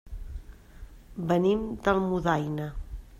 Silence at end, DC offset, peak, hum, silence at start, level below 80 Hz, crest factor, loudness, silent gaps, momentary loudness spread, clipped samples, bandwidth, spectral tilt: 0 s; under 0.1%; -10 dBFS; none; 0.05 s; -42 dBFS; 20 dB; -28 LUFS; none; 19 LU; under 0.1%; 14.5 kHz; -7.5 dB/octave